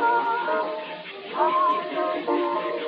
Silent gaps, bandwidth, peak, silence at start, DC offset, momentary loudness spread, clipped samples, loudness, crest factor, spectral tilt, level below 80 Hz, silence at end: none; 5.4 kHz; -10 dBFS; 0 s; under 0.1%; 12 LU; under 0.1%; -25 LUFS; 16 dB; -1.5 dB/octave; -82 dBFS; 0 s